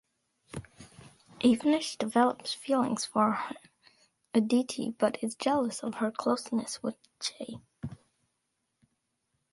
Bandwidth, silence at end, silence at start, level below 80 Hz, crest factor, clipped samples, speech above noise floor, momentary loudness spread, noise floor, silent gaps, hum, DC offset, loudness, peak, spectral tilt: 11.5 kHz; 1.6 s; 0.55 s; -68 dBFS; 20 dB; under 0.1%; 51 dB; 17 LU; -81 dBFS; none; none; under 0.1%; -30 LUFS; -12 dBFS; -4.5 dB/octave